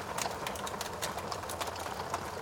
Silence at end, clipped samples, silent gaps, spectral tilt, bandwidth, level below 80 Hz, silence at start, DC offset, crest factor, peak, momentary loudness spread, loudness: 0 s; under 0.1%; none; -2.5 dB/octave; over 20 kHz; -58 dBFS; 0 s; under 0.1%; 22 dB; -16 dBFS; 2 LU; -37 LUFS